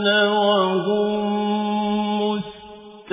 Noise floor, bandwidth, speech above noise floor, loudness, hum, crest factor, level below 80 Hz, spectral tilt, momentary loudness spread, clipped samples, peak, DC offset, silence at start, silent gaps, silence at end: -41 dBFS; 3.9 kHz; 22 dB; -20 LUFS; none; 16 dB; -60 dBFS; -9.5 dB/octave; 14 LU; under 0.1%; -6 dBFS; under 0.1%; 0 s; none; 0 s